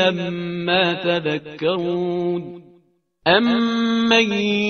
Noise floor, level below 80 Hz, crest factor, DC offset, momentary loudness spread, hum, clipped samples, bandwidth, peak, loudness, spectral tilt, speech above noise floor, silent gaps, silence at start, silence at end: -59 dBFS; -60 dBFS; 18 dB; under 0.1%; 9 LU; none; under 0.1%; 6.6 kHz; -2 dBFS; -19 LUFS; -5 dB/octave; 40 dB; none; 0 s; 0 s